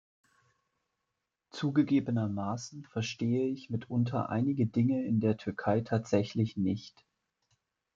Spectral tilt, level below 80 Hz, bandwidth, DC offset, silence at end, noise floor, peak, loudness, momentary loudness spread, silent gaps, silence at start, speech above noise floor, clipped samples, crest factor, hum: -7.5 dB/octave; -70 dBFS; 7.6 kHz; under 0.1%; 1.05 s; -86 dBFS; -12 dBFS; -32 LUFS; 8 LU; none; 1.55 s; 55 dB; under 0.1%; 20 dB; none